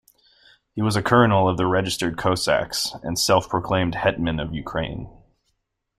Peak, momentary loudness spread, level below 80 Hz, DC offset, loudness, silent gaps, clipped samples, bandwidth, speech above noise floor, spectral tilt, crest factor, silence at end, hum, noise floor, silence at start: -2 dBFS; 11 LU; -46 dBFS; under 0.1%; -22 LUFS; none; under 0.1%; 15.5 kHz; 52 dB; -4.5 dB/octave; 20 dB; 0.9 s; none; -74 dBFS; 0.75 s